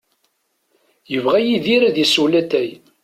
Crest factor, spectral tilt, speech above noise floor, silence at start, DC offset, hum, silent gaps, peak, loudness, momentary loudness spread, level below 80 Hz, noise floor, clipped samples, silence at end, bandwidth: 16 dB; -4 dB/octave; 51 dB; 1.1 s; under 0.1%; none; none; -2 dBFS; -16 LUFS; 8 LU; -62 dBFS; -67 dBFS; under 0.1%; 0.3 s; 15.5 kHz